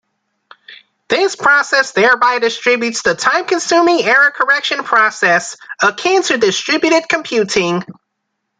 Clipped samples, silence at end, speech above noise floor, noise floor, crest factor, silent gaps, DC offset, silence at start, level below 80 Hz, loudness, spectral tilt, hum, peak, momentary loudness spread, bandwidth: under 0.1%; 0.7 s; 59 dB; -73 dBFS; 14 dB; none; under 0.1%; 0.7 s; -58 dBFS; -13 LUFS; -2.5 dB/octave; none; 0 dBFS; 5 LU; 9.6 kHz